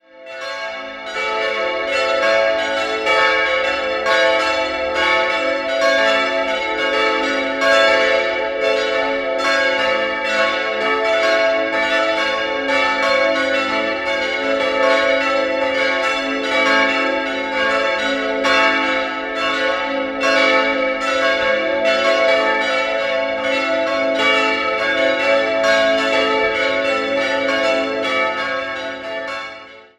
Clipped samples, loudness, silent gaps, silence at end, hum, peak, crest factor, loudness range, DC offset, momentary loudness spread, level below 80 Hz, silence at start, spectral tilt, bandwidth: under 0.1%; -17 LUFS; none; 0.15 s; none; 0 dBFS; 18 dB; 1 LU; under 0.1%; 6 LU; -52 dBFS; 0.15 s; -2.5 dB/octave; 12 kHz